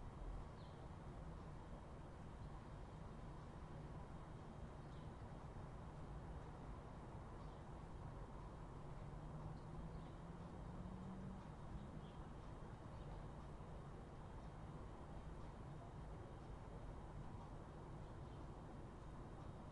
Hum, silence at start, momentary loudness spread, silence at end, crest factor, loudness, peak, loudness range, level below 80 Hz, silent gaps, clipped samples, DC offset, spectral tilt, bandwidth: none; 0 s; 2 LU; 0 s; 14 dB; -56 LUFS; -40 dBFS; 2 LU; -58 dBFS; none; under 0.1%; under 0.1%; -7.5 dB/octave; 11 kHz